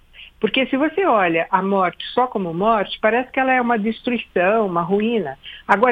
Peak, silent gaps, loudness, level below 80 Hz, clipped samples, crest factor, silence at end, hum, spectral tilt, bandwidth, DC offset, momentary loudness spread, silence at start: 0 dBFS; none; -19 LUFS; -52 dBFS; under 0.1%; 18 dB; 0 s; none; -7.5 dB/octave; 8.2 kHz; under 0.1%; 5 LU; 0.2 s